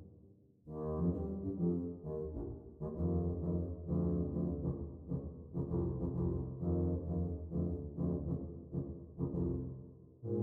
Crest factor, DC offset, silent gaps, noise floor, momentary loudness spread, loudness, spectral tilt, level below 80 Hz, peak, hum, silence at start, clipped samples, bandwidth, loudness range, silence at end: 14 dB; under 0.1%; none; -63 dBFS; 9 LU; -39 LUFS; -14 dB/octave; -50 dBFS; -24 dBFS; none; 0 s; under 0.1%; 1.7 kHz; 2 LU; 0 s